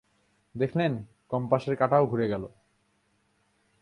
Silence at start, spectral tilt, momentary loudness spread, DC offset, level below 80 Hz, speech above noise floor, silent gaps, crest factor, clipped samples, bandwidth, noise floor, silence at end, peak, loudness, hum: 0.55 s; -8.5 dB/octave; 14 LU; under 0.1%; -62 dBFS; 44 dB; none; 22 dB; under 0.1%; 11 kHz; -70 dBFS; 1.35 s; -8 dBFS; -28 LUFS; none